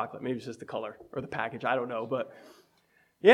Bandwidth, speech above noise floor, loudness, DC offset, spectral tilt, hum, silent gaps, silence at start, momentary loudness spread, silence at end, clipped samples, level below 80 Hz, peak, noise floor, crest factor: 12.5 kHz; 33 dB; -33 LUFS; under 0.1%; -6 dB/octave; none; none; 0 s; 9 LU; 0 s; under 0.1%; -72 dBFS; -6 dBFS; -68 dBFS; 24 dB